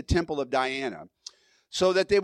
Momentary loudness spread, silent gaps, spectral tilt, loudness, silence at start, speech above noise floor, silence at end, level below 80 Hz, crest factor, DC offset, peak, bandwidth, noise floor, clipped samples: 22 LU; none; -5 dB/octave; -27 LUFS; 0 s; 25 dB; 0 s; -44 dBFS; 16 dB; under 0.1%; -12 dBFS; 12 kHz; -50 dBFS; under 0.1%